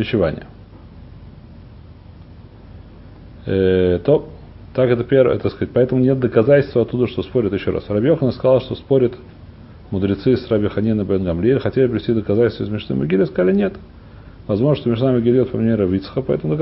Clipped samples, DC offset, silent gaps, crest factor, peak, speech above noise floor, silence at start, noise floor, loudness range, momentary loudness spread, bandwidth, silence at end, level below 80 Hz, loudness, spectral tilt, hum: under 0.1%; under 0.1%; none; 16 dB; -2 dBFS; 23 dB; 0 s; -40 dBFS; 5 LU; 7 LU; 5.8 kHz; 0 s; -40 dBFS; -18 LUFS; -13 dB/octave; none